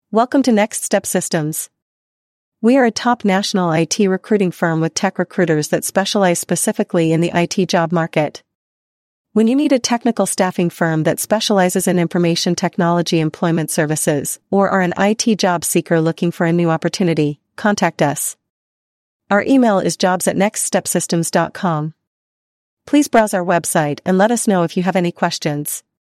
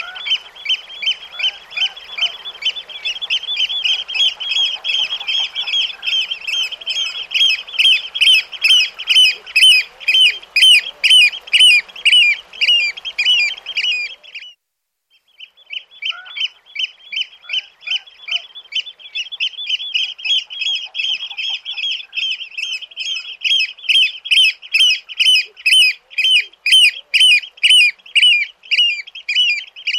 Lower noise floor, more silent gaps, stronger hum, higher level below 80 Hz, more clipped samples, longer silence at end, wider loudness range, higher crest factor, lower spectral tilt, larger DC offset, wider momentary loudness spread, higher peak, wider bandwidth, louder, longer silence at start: first, under -90 dBFS vs -76 dBFS; first, 1.82-2.52 s, 8.55-9.25 s, 18.50-19.20 s, 22.07-22.77 s vs none; neither; first, -60 dBFS vs -66 dBFS; neither; first, 0.25 s vs 0 s; second, 2 LU vs 12 LU; about the same, 14 dB vs 14 dB; first, -4.5 dB/octave vs 5.5 dB/octave; neither; second, 5 LU vs 14 LU; about the same, -2 dBFS vs -2 dBFS; about the same, 15.5 kHz vs 16 kHz; second, -16 LUFS vs -13 LUFS; about the same, 0.1 s vs 0 s